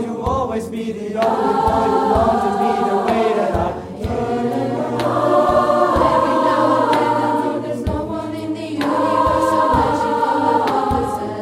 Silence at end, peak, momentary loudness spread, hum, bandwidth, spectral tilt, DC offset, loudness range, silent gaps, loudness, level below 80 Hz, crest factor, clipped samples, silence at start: 0 s; -2 dBFS; 9 LU; none; 16 kHz; -6.5 dB/octave; under 0.1%; 2 LU; none; -17 LUFS; -36 dBFS; 16 dB; under 0.1%; 0 s